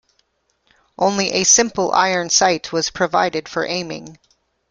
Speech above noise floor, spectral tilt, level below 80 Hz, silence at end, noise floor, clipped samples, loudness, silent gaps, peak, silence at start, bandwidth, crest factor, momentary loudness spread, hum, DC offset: 48 dB; -2 dB/octave; -56 dBFS; 0.55 s; -66 dBFS; under 0.1%; -17 LUFS; none; -2 dBFS; 1 s; 11 kHz; 18 dB; 11 LU; none; under 0.1%